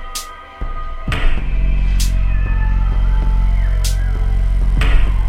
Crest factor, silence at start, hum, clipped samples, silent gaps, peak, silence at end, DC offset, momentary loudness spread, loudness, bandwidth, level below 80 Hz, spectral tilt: 14 dB; 0 s; none; under 0.1%; none; 0 dBFS; 0 s; under 0.1%; 11 LU; -19 LUFS; 13.5 kHz; -14 dBFS; -5 dB/octave